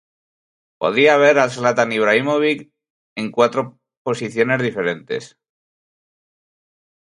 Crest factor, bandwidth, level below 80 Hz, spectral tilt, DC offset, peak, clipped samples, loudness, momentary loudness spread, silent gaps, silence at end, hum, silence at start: 20 dB; 11 kHz; -66 dBFS; -5 dB/octave; under 0.1%; 0 dBFS; under 0.1%; -18 LUFS; 15 LU; 2.90-3.16 s, 3.97-4.05 s; 1.8 s; none; 0.8 s